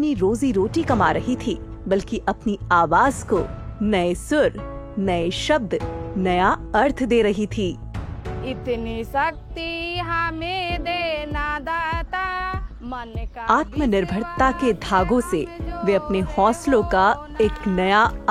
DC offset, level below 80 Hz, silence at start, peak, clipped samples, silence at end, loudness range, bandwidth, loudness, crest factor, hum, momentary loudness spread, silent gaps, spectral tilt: under 0.1%; -36 dBFS; 0 s; -2 dBFS; under 0.1%; 0 s; 5 LU; 14.5 kHz; -22 LUFS; 18 dB; none; 10 LU; none; -5.5 dB/octave